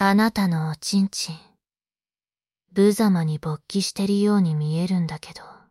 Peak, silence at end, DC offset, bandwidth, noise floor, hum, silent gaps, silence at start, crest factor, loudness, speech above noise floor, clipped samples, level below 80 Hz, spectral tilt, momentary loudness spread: -6 dBFS; 0.2 s; under 0.1%; 14 kHz; under -90 dBFS; none; none; 0 s; 16 dB; -22 LUFS; over 68 dB; under 0.1%; -58 dBFS; -6 dB/octave; 12 LU